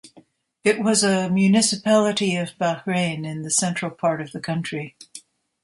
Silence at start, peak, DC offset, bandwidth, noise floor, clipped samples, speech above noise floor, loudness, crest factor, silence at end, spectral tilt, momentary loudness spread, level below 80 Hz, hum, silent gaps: 0.05 s; -4 dBFS; under 0.1%; 11.5 kHz; -54 dBFS; under 0.1%; 33 dB; -21 LUFS; 18 dB; 0.45 s; -4 dB/octave; 12 LU; -64 dBFS; none; none